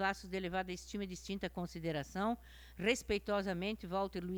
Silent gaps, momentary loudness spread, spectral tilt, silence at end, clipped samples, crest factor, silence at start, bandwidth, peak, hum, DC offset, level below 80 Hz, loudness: none; 7 LU; -5 dB/octave; 0 s; under 0.1%; 20 dB; 0 s; over 20 kHz; -20 dBFS; none; under 0.1%; -56 dBFS; -39 LUFS